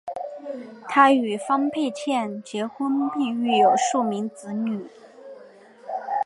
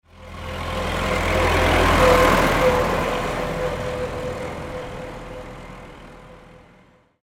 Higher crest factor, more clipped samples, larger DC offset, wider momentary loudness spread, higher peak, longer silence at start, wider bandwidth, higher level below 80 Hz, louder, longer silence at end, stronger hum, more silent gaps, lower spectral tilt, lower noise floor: about the same, 22 dB vs 20 dB; neither; neither; second, 18 LU vs 21 LU; about the same, -2 dBFS vs -2 dBFS; about the same, 0.05 s vs 0.15 s; second, 11.5 kHz vs 16.5 kHz; second, -78 dBFS vs -32 dBFS; second, -23 LUFS vs -20 LUFS; second, 0 s vs 0.85 s; neither; neither; about the same, -4 dB/octave vs -5 dB/octave; second, -48 dBFS vs -54 dBFS